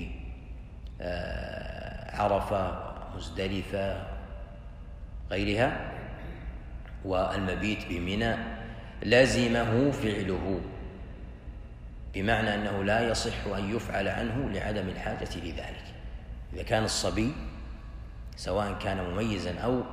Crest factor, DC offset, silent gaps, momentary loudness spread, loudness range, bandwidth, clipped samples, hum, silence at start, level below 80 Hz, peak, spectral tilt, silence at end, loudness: 24 dB; under 0.1%; none; 18 LU; 6 LU; 15.5 kHz; under 0.1%; none; 0 s; -42 dBFS; -8 dBFS; -5 dB/octave; 0 s; -30 LUFS